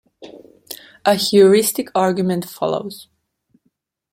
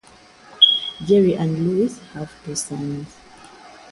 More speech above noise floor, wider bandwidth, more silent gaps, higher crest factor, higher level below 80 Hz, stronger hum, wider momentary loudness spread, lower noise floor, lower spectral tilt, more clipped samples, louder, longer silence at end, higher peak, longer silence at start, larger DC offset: first, 52 dB vs 27 dB; first, 16.5 kHz vs 11.5 kHz; neither; about the same, 18 dB vs 22 dB; second, -64 dBFS vs -56 dBFS; neither; first, 23 LU vs 20 LU; first, -68 dBFS vs -48 dBFS; about the same, -4.5 dB/octave vs -4.5 dB/octave; neither; about the same, -17 LUFS vs -18 LUFS; first, 1.1 s vs 0.15 s; about the same, -2 dBFS vs 0 dBFS; second, 0.2 s vs 0.5 s; neither